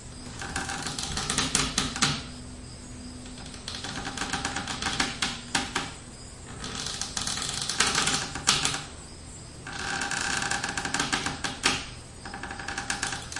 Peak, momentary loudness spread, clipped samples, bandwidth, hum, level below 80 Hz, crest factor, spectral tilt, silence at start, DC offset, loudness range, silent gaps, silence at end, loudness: 0 dBFS; 17 LU; under 0.1%; 11.5 kHz; none; -48 dBFS; 30 dB; -1.5 dB/octave; 0 s; under 0.1%; 4 LU; none; 0 s; -28 LUFS